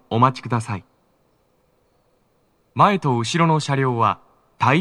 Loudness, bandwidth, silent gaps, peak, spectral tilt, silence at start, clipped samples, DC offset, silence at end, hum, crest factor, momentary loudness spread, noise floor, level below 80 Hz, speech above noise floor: -20 LUFS; 11 kHz; none; -2 dBFS; -6 dB/octave; 0.1 s; under 0.1%; under 0.1%; 0 s; none; 20 dB; 14 LU; -63 dBFS; -66 dBFS; 44 dB